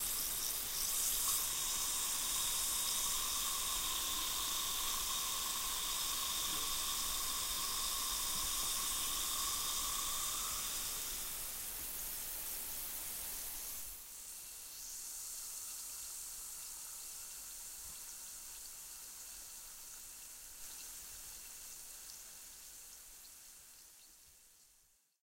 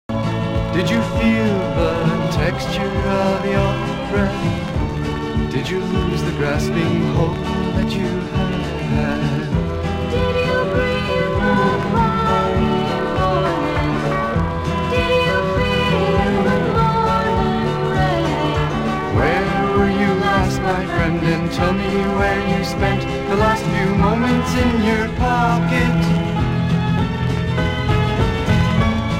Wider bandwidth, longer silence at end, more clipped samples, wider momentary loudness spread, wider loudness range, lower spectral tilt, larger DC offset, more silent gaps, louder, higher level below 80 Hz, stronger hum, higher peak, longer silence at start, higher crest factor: about the same, 16 kHz vs 15.5 kHz; first, 0.55 s vs 0 s; neither; first, 15 LU vs 5 LU; first, 14 LU vs 3 LU; second, 1 dB/octave vs -6.5 dB/octave; neither; neither; second, -38 LUFS vs -18 LUFS; second, -58 dBFS vs -30 dBFS; neither; second, -20 dBFS vs -2 dBFS; about the same, 0 s vs 0.1 s; first, 20 dB vs 14 dB